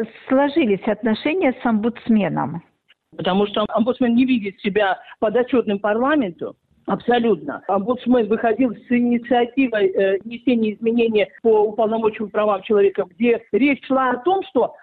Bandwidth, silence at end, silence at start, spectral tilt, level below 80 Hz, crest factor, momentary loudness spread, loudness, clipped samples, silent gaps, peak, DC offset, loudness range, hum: 4.5 kHz; 0.1 s; 0 s; -9.5 dB/octave; -58 dBFS; 12 dB; 5 LU; -19 LUFS; under 0.1%; none; -6 dBFS; under 0.1%; 2 LU; none